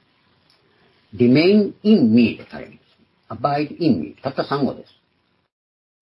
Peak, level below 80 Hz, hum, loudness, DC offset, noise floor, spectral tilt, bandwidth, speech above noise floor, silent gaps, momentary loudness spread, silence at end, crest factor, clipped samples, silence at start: -4 dBFS; -62 dBFS; none; -18 LUFS; under 0.1%; -66 dBFS; -9.5 dB/octave; 5.8 kHz; 48 dB; none; 22 LU; 1.2 s; 18 dB; under 0.1%; 1.15 s